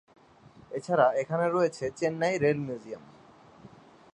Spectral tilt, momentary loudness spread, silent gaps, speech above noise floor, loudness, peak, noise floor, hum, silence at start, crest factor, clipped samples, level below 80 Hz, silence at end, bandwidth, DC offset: -6 dB/octave; 15 LU; none; 28 dB; -28 LUFS; -8 dBFS; -55 dBFS; none; 0.7 s; 22 dB; under 0.1%; -68 dBFS; 0.45 s; 10.5 kHz; under 0.1%